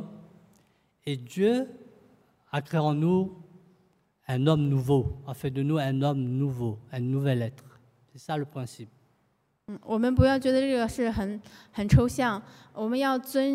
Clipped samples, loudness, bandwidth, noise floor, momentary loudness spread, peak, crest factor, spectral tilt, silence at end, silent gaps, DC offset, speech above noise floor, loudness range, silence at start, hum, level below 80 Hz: under 0.1%; -27 LUFS; 15.5 kHz; -71 dBFS; 17 LU; -8 dBFS; 20 dB; -7.5 dB/octave; 0 s; none; under 0.1%; 45 dB; 6 LU; 0 s; none; -46 dBFS